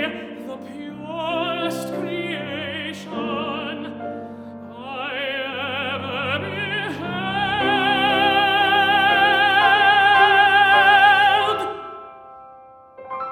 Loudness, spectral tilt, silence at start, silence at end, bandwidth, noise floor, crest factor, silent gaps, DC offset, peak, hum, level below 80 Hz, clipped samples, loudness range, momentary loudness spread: -18 LUFS; -4 dB/octave; 0 s; 0 s; 15.5 kHz; -45 dBFS; 18 dB; none; under 0.1%; -2 dBFS; none; -60 dBFS; under 0.1%; 14 LU; 21 LU